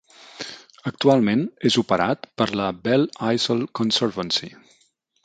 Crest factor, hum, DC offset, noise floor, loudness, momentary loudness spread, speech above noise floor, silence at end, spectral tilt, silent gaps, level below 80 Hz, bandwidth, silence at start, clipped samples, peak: 20 dB; none; under 0.1%; -64 dBFS; -21 LUFS; 16 LU; 43 dB; 0.75 s; -5 dB/octave; none; -60 dBFS; 9.2 kHz; 0.35 s; under 0.1%; -4 dBFS